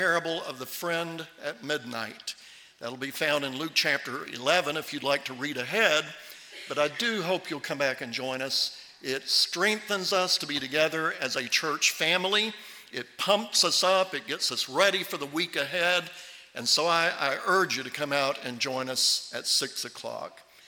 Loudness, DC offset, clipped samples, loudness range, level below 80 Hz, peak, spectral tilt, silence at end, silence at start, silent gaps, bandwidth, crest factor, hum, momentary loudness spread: -27 LUFS; under 0.1%; under 0.1%; 5 LU; -76 dBFS; -6 dBFS; -1.5 dB/octave; 0.25 s; 0 s; none; 18 kHz; 22 dB; none; 14 LU